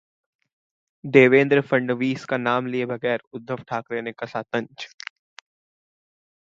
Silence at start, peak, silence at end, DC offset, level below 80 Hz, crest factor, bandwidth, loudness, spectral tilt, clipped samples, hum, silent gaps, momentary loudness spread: 1.05 s; 0 dBFS; 1.55 s; under 0.1%; -70 dBFS; 24 dB; 7.6 kHz; -22 LUFS; -7 dB/octave; under 0.1%; none; 3.27-3.31 s; 20 LU